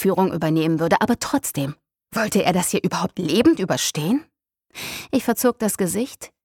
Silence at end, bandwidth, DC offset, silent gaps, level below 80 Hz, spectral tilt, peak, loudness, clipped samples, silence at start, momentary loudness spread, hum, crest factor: 0.2 s; 18.5 kHz; under 0.1%; none; -54 dBFS; -4.5 dB/octave; -2 dBFS; -21 LUFS; under 0.1%; 0 s; 12 LU; none; 18 dB